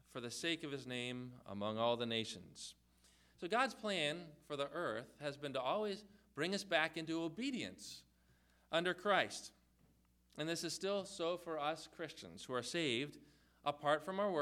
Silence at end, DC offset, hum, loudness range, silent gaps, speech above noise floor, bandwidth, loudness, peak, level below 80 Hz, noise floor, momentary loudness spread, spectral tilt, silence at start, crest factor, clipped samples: 0 s; under 0.1%; none; 2 LU; none; 32 dB; 16 kHz; -41 LUFS; -18 dBFS; -76 dBFS; -73 dBFS; 13 LU; -3.5 dB/octave; 0.15 s; 24 dB; under 0.1%